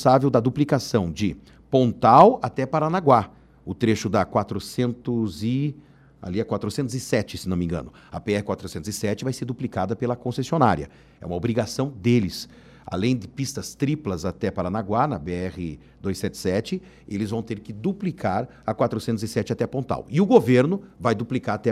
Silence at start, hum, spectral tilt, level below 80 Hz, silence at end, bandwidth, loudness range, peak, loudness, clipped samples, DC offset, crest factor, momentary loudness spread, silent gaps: 0 s; none; -6.5 dB/octave; -52 dBFS; 0 s; 15 kHz; 8 LU; -2 dBFS; -24 LUFS; under 0.1%; under 0.1%; 22 dB; 13 LU; none